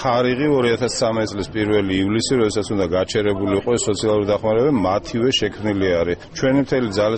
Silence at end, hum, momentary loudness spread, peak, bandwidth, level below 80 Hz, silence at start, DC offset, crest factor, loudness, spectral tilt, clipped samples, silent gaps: 0 s; none; 4 LU; -6 dBFS; 8.8 kHz; -44 dBFS; 0 s; under 0.1%; 12 dB; -19 LUFS; -5 dB/octave; under 0.1%; none